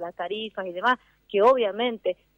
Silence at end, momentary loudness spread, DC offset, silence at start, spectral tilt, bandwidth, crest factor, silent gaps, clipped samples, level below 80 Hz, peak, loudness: 0.25 s; 11 LU; under 0.1%; 0 s; -5 dB/octave; 7.4 kHz; 16 dB; none; under 0.1%; -66 dBFS; -8 dBFS; -25 LUFS